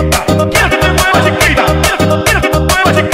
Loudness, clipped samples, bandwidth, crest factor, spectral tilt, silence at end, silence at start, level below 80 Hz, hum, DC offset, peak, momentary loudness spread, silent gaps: -9 LUFS; under 0.1%; 16.5 kHz; 10 dB; -4 dB/octave; 0 s; 0 s; -20 dBFS; none; 0.7%; 0 dBFS; 2 LU; none